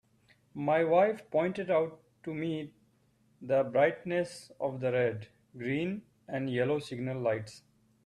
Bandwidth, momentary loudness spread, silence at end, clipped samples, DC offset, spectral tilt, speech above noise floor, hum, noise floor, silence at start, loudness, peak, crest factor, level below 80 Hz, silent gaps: 12 kHz; 17 LU; 0.45 s; under 0.1%; under 0.1%; -7 dB/octave; 38 dB; none; -69 dBFS; 0.55 s; -32 LUFS; -14 dBFS; 18 dB; -72 dBFS; none